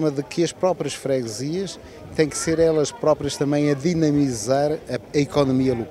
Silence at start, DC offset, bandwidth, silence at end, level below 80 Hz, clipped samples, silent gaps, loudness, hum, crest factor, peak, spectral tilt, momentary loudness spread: 0 s; under 0.1%; 14 kHz; 0 s; -50 dBFS; under 0.1%; none; -22 LUFS; none; 16 dB; -4 dBFS; -5.5 dB/octave; 7 LU